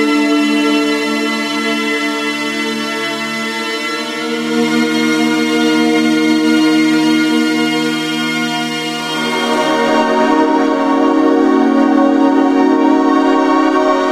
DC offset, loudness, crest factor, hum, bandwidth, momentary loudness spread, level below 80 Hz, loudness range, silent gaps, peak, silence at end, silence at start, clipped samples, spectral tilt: under 0.1%; -13 LUFS; 12 dB; none; 15 kHz; 6 LU; -56 dBFS; 5 LU; none; 0 dBFS; 0 s; 0 s; under 0.1%; -3.5 dB/octave